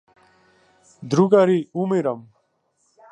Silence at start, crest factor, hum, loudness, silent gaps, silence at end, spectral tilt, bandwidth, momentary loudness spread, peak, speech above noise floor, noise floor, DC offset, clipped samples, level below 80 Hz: 1 s; 20 dB; none; -19 LUFS; none; 0.9 s; -7.5 dB/octave; 9.8 kHz; 16 LU; -2 dBFS; 49 dB; -68 dBFS; under 0.1%; under 0.1%; -72 dBFS